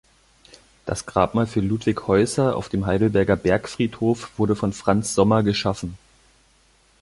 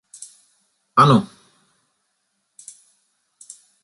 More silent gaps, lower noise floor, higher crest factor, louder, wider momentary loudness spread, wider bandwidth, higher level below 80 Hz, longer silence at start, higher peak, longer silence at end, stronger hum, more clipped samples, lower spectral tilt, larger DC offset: neither; second, -58 dBFS vs -72 dBFS; about the same, 20 dB vs 22 dB; second, -22 LUFS vs -16 LUFS; second, 8 LU vs 28 LU; about the same, 11.5 kHz vs 11.5 kHz; first, -44 dBFS vs -62 dBFS; about the same, 0.85 s vs 0.95 s; about the same, -2 dBFS vs -2 dBFS; second, 1.05 s vs 2.6 s; neither; neither; about the same, -6 dB/octave vs -6 dB/octave; neither